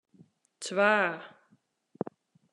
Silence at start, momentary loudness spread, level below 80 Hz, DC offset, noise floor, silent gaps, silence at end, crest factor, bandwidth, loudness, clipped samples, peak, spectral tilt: 0.6 s; 17 LU; -90 dBFS; under 0.1%; -69 dBFS; none; 1.25 s; 24 dB; 11.5 kHz; -29 LUFS; under 0.1%; -10 dBFS; -4 dB/octave